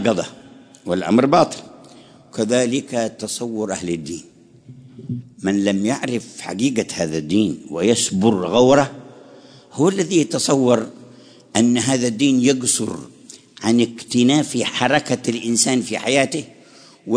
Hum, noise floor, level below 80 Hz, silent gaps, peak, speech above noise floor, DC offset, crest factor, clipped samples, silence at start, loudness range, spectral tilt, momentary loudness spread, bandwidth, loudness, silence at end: none; -47 dBFS; -58 dBFS; none; -2 dBFS; 28 dB; under 0.1%; 18 dB; under 0.1%; 0 s; 6 LU; -4 dB/octave; 15 LU; 11 kHz; -19 LUFS; 0 s